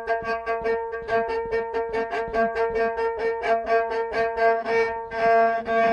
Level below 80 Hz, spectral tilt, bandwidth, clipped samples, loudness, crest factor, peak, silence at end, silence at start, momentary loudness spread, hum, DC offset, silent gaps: -50 dBFS; -5 dB/octave; 8.2 kHz; under 0.1%; -24 LUFS; 14 dB; -8 dBFS; 0 s; 0 s; 6 LU; none; under 0.1%; none